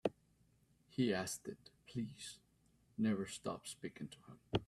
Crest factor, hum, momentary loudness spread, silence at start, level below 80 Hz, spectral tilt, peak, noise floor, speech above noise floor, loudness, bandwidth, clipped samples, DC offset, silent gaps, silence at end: 24 dB; none; 16 LU; 0.05 s; -70 dBFS; -5 dB/octave; -20 dBFS; -74 dBFS; 32 dB; -43 LUFS; 14 kHz; under 0.1%; under 0.1%; none; 0.05 s